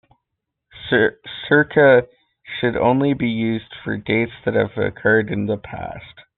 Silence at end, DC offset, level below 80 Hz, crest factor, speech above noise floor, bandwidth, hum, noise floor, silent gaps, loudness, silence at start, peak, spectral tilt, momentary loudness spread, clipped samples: 0.15 s; under 0.1%; -52 dBFS; 18 dB; 61 dB; 4.3 kHz; none; -79 dBFS; none; -19 LUFS; 0.75 s; -2 dBFS; -4.5 dB/octave; 18 LU; under 0.1%